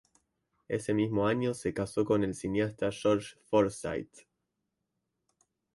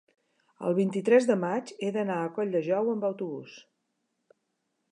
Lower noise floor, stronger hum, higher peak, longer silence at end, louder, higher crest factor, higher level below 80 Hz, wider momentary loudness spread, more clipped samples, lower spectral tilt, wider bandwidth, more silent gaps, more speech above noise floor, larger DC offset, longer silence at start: first, -84 dBFS vs -79 dBFS; neither; second, -14 dBFS vs -8 dBFS; first, 1.55 s vs 1.3 s; second, -31 LUFS vs -28 LUFS; about the same, 18 dB vs 20 dB; first, -60 dBFS vs -84 dBFS; second, 9 LU vs 13 LU; neither; about the same, -6 dB/octave vs -7 dB/octave; about the same, 11.5 kHz vs 10.5 kHz; neither; about the same, 54 dB vs 52 dB; neither; about the same, 0.7 s vs 0.6 s